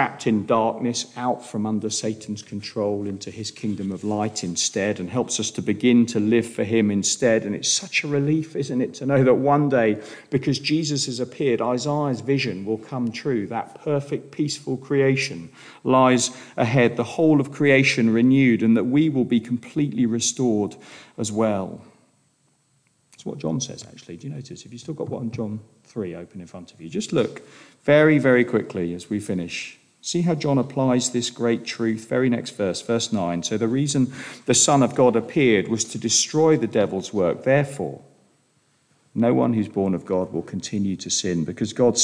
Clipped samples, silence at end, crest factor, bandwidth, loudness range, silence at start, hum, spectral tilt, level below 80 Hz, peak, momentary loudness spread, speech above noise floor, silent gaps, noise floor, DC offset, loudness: under 0.1%; 0 s; 18 dB; 10.5 kHz; 10 LU; 0 s; none; -4.5 dB/octave; -64 dBFS; -4 dBFS; 14 LU; 43 dB; none; -65 dBFS; under 0.1%; -22 LUFS